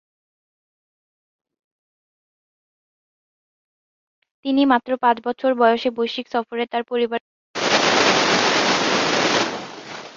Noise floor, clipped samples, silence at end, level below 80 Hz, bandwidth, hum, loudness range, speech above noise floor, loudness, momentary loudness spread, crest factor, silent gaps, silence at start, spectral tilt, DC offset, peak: under -90 dBFS; under 0.1%; 0.05 s; -64 dBFS; 7.8 kHz; none; 6 LU; over 70 dB; -19 LUFS; 12 LU; 20 dB; 7.20-7.54 s; 4.45 s; -2.5 dB/octave; under 0.1%; -2 dBFS